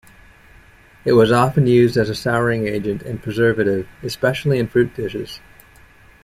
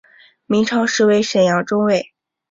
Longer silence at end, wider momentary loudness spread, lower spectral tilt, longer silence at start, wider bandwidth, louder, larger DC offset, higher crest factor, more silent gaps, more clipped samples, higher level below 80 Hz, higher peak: first, 0.85 s vs 0.5 s; first, 12 LU vs 6 LU; first, -7 dB/octave vs -4.5 dB/octave; first, 1.05 s vs 0.5 s; first, 15 kHz vs 7.8 kHz; about the same, -18 LUFS vs -16 LUFS; neither; about the same, 16 dB vs 14 dB; neither; neither; first, -46 dBFS vs -58 dBFS; about the same, -2 dBFS vs -4 dBFS